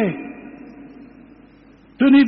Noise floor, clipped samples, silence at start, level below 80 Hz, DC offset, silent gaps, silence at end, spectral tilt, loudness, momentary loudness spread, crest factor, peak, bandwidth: -48 dBFS; under 0.1%; 0 s; -56 dBFS; under 0.1%; none; 0 s; -5 dB/octave; -19 LUFS; 25 LU; 14 dB; -6 dBFS; 5 kHz